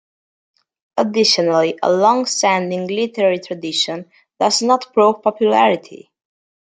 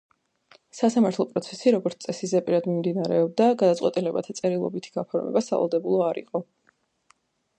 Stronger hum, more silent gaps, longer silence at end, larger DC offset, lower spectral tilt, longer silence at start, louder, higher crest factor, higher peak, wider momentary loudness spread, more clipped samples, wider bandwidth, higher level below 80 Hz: neither; neither; second, 0.85 s vs 1.15 s; neither; second, -3.5 dB/octave vs -6.5 dB/octave; first, 0.95 s vs 0.75 s; first, -16 LUFS vs -25 LUFS; about the same, 16 dB vs 18 dB; first, -2 dBFS vs -8 dBFS; about the same, 8 LU vs 9 LU; neither; about the same, 9.6 kHz vs 9.2 kHz; about the same, -70 dBFS vs -74 dBFS